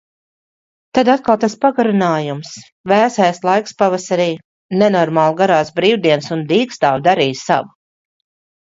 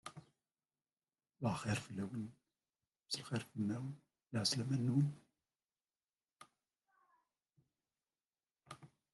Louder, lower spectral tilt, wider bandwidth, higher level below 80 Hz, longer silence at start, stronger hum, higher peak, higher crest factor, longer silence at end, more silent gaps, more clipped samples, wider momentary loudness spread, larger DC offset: first, -15 LUFS vs -40 LUFS; about the same, -5.5 dB/octave vs -5 dB/octave; second, 7.8 kHz vs 12 kHz; first, -60 dBFS vs -78 dBFS; first, 0.95 s vs 0.05 s; neither; first, 0 dBFS vs -22 dBFS; second, 16 dB vs 22 dB; first, 1 s vs 0.25 s; first, 2.72-2.84 s, 4.45-4.69 s vs none; neither; second, 7 LU vs 21 LU; neither